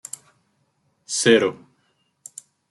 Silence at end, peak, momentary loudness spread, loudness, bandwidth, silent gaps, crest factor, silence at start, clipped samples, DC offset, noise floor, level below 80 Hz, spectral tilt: 1.15 s; -4 dBFS; 24 LU; -19 LUFS; 12.5 kHz; none; 22 dB; 1.1 s; under 0.1%; under 0.1%; -68 dBFS; -74 dBFS; -3 dB/octave